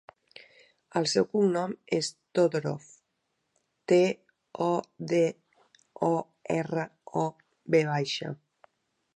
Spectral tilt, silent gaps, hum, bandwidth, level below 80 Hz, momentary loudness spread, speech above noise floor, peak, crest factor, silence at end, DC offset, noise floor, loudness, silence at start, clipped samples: -5.5 dB/octave; none; none; 11 kHz; -74 dBFS; 13 LU; 52 dB; -10 dBFS; 20 dB; 0.8 s; under 0.1%; -79 dBFS; -29 LUFS; 0.95 s; under 0.1%